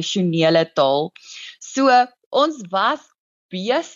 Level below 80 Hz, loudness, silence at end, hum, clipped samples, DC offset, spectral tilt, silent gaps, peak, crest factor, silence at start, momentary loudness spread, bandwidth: -70 dBFS; -19 LUFS; 0.05 s; none; under 0.1%; under 0.1%; -4.5 dB/octave; 2.26-2.31 s, 3.18-3.49 s; -4 dBFS; 16 dB; 0 s; 16 LU; 7.8 kHz